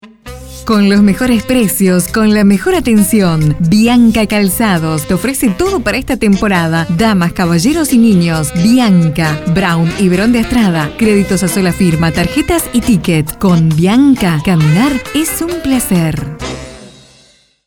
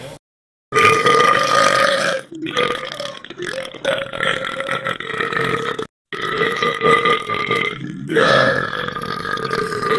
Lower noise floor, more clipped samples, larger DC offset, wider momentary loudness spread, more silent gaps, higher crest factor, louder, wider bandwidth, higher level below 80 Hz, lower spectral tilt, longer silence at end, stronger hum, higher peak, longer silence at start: second, -48 dBFS vs under -90 dBFS; neither; first, 0.2% vs under 0.1%; second, 6 LU vs 13 LU; second, none vs 0.19-0.71 s, 5.89-6.05 s; second, 10 dB vs 18 dB; first, -11 LUFS vs -17 LUFS; first, 19.5 kHz vs 12 kHz; first, -32 dBFS vs -54 dBFS; first, -5.5 dB/octave vs -3.5 dB/octave; first, 0.8 s vs 0 s; neither; about the same, 0 dBFS vs 0 dBFS; about the same, 0.05 s vs 0 s